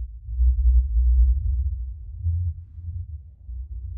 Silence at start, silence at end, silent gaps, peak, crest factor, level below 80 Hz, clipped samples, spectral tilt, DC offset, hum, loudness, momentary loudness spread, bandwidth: 0 s; 0 s; none; -10 dBFS; 12 dB; -22 dBFS; under 0.1%; -19.5 dB/octave; under 0.1%; none; -24 LUFS; 17 LU; 0.3 kHz